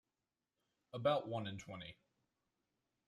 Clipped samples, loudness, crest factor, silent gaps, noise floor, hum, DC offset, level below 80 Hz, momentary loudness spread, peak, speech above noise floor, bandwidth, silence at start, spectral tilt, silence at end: under 0.1%; -41 LUFS; 22 dB; none; under -90 dBFS; none; under 0.1%; -78 dBFS; 15 LU; -22 dBFS; over 49 dB; 11.5 kHz; 0.95 s; -6 dB/octave; 1.15 s